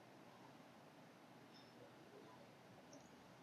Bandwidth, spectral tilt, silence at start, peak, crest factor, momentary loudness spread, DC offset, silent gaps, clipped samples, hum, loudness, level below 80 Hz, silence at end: 13.5 kHz; -4.5 dB/octave; 0 s; -48 dBFS; 14 dB; 2 LU; under 0.1%; none; under 0.1%; none; -63 LUFS; under -90 dBFS; 0 s